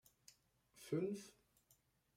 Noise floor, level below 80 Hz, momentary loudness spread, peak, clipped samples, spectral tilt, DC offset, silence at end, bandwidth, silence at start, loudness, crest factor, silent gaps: -78 dBFS; -86 dBFS; 24 LU; -30 dBFS; under 0.1%; -6.5 dB/octave; under 0.1%; 0.85 s; 16 kHz; 0.75 s; -45 LUFS; 20 dB; none